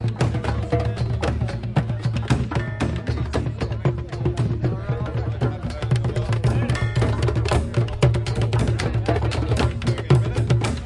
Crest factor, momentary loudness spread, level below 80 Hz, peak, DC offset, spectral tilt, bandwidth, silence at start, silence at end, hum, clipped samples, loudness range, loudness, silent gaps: 18 dB; 5 LU; -32 dBFS; -4 dBFS; under 0.1%; -7 dB/octave; 11 kHz; 0 s; 0 s; none; under 0.1%; 3 LU; -23 LUFS; none